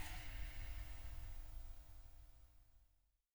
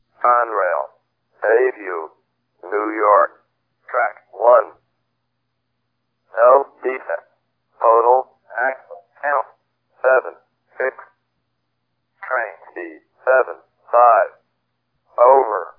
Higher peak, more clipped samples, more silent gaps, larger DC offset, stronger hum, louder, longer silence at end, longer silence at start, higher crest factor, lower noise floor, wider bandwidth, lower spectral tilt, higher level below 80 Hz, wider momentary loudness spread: second, -34 dBFS vs 0 dBFS; neither; neither; neither; neither; second, -55 LUFS vs -17 LUFS; first, 0.5 s vs 0.1 s; second, 0 s vs 0.2 s; about the same, 16 dB vs 18 dB; first, -79 dBFS vs -74 dBFS; first, over 20 kHz vs 3 kHz; second, -3.5 dB/octave vs -7.5 dB/octave; first, -52 dBFS vs -86 dBFS; second, 14 LU vs 19 LU